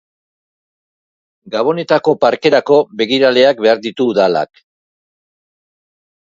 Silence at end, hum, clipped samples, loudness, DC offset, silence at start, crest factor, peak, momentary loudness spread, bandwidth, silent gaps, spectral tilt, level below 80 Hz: 1.95 s; none; under 0.1%; -13 LUFS; under 0.1%; 1.45 s; 16 dB; 0 dBFS; 7 LU; 7.6 kHz; none; -5.5 dB/octave; -62 dBFS